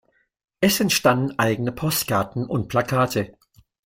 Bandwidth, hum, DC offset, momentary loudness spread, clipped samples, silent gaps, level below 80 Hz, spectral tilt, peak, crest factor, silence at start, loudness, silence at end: 16.5 kHz; none; under 0.1%; 8 LU; under 0.1%; none; -52 dBFS; -4.5 dB/octave; -4 dBFS; 18 dB; 0.6 s; -21 LUFS; 0.55 s